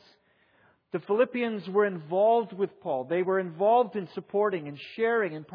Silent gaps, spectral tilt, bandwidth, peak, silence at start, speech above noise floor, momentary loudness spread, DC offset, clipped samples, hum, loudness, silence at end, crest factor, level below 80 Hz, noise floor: none; -9 dB/octave; 5.2 kHz; -12 dBFS; 0.95 s; 38 dB; 10 LU; under 0.1%; under 0.1%; none; -27 LUFS; 0.1 s; 16 dB; -84 dBFS; -65 dBFS